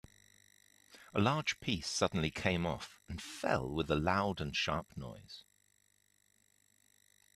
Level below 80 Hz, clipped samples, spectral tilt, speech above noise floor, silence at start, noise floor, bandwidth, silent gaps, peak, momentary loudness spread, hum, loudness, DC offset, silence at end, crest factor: -58 dBFS; under 0.1%; -4.5 dB/octave; 38 dB; 0.95 s; -73 dBFS; 14.5 kHz; none; -16 dBFS; 16 LU; 50 Hz at -60 dBFS; -35 LUFS; under 0.1%; 1.95 s; 22 dB